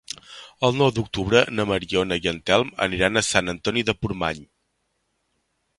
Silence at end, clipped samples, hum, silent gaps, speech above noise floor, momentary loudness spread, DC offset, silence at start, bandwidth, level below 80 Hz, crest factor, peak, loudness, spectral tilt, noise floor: 1.35 s; under 0.1%; none; none; 51 dB; 9 LU; under 0.1%; 0.3 s; 11.5 kHz; -46 dBFS; 22 dB; -2 dBFS; -22 LUFS; -4 dB/octave; -73 dBFS